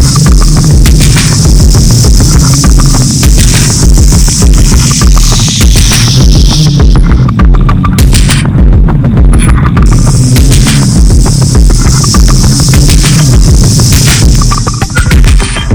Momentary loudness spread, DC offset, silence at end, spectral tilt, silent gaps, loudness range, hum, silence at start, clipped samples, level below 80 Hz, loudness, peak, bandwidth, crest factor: 2 LU; under 0.1%; 0 s; -4.5 dB/octave; none; 1 LU; none; 0 s; 30%; -6 dBFS; -5 LUFS; 0 dBFS; over 20 kHz; 4 dB